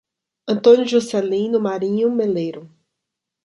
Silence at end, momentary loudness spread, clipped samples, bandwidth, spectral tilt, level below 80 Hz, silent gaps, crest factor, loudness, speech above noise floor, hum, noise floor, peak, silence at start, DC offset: 0.8 s; 13 LU; under 0.1%; 11.5 kHz; -6 dB/octave; -68 dBFS; none; 18 dB; -18 LUFS; 64 dB; none; -82 dBFS; -2 dBFS; 0.45 s; under 0.1%